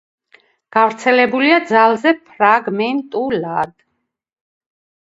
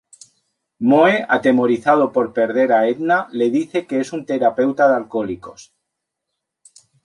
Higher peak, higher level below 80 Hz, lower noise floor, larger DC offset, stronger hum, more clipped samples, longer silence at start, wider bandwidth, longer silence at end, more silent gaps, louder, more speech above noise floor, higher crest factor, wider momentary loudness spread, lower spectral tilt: about the same, 0 dBFS vs -2 dBFS; about the same, -62 dBFS vs -62 dBFS; second, -72 dBFS vs -79 dBFS; neither; neither; neither; about the same, 0.75 s vs 0.8 s; second, 8 kHz vs 11 kHz; about the same, 1.4 s vs 1.45 s; neither; about the same, -15 LUFS vs -17 LUFS; second, 57 dB vs 62 dB; about the same, 16 dB vs 16 dB; about the same, 8 LU vs 9 LU; about the same, -5 dB/octave vs -6 dB/octave